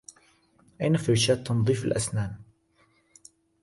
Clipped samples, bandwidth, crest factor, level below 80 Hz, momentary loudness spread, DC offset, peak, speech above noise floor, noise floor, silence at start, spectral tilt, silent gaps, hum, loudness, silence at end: under 0.1%; 11.5 kHz; 18 dB; -56 dBFS; 10 LU; under 0.1%; -12 dBFS; 41 dB; -66 dBFS; 0.8 s; -5 dB/octave; none; none; -26 LUFS; 1.2 s